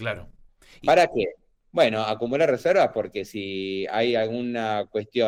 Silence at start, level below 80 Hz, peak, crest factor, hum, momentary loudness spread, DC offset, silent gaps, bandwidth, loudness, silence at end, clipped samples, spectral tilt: 0 s; -58 dBFS; -8 dBFS; 16 dB; none; 12 LU; under 0.1%; none; 16 kHz; -24 LUFS; 0 s; under 0.1%; -5.5 dB/octave